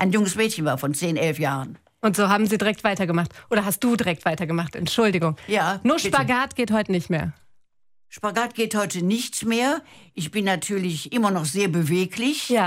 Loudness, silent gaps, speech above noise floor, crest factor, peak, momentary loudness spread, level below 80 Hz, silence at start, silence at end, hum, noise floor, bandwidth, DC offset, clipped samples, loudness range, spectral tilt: -23 LUFS; none; 34 dB; 18 dB; -4 dBFS; 6 LU; -56 dBFS; 0 s; 0 s; none; -57 dBFS; 16 kHz; under 0.1%; under 0.1%; 3 LU; -4.5 dB/octave